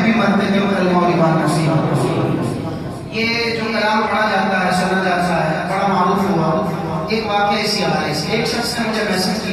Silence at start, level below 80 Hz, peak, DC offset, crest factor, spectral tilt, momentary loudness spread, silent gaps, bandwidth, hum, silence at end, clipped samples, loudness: 0 s; -46 dBFS; -2 dBFS; under 0.1%; 14 dB; -5.5 dB/octave; 5 LU; none; 14.5 kHz; none; 0 s; under 0.1%; -17 LUFS